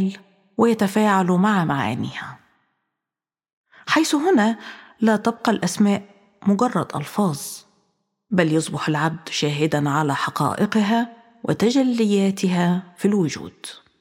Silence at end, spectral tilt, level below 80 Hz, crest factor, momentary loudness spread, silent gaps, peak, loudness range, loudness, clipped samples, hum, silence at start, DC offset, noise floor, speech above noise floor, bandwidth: 0.25 s; -5.5 dB/octave; -66 dBFS; 18 dB; 14 LU; 3.53-3.64 s; -2 dBFS; 3 LU; -21 LUFS; under 0.1%; none; 0 s; under 0.1%; -90 dBFS; 70 dB; 16.5 kHz